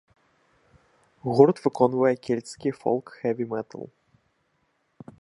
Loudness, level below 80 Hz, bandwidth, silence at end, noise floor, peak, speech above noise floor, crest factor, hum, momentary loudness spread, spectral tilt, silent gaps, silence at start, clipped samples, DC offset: -24 LUFS; -68 dBFS; 11 kHz; 1.35 s; -71 dBFS; -4 dBFS; 47 dB; 24 dB; none; 17 LU; -7.5 dB/octave; none; 1.25 s; under 0.1%; under 0.1%